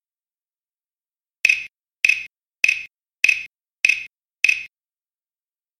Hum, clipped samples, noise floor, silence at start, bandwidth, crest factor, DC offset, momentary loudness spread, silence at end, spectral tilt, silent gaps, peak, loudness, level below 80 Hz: none; under 0.1%; under -90 dBFS; 1.45 s; 16 kHz; 24 dB; under 0.1%; 20 LU; 1.15 s; 2.5 dB/octave; none; 0 dBFS; -19 LUFS; -68 dBFS